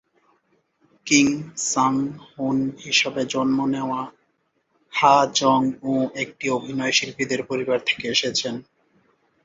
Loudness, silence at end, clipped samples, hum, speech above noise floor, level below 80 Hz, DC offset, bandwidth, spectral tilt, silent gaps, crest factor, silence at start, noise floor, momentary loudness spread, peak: -21 LUFS; 0.85 s; under 0.1%; none; 48 dB; -64 dBFS; under 0.1%; 8 kHz; -3 dB/octave; none; 22 dB; 1.05 s; -70 dBFS; 11 LU; -2 dBFS